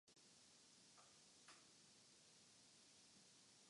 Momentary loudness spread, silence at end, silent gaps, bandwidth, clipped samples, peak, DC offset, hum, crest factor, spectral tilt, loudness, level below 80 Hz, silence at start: 2 LU; 0 s; none; 11 kHz; under 0.1%; -54 dBFS; under 0.1%; none; 18 dB; -1 dB/octave; -68 LUFS; under -90 dBFS; 0.05 s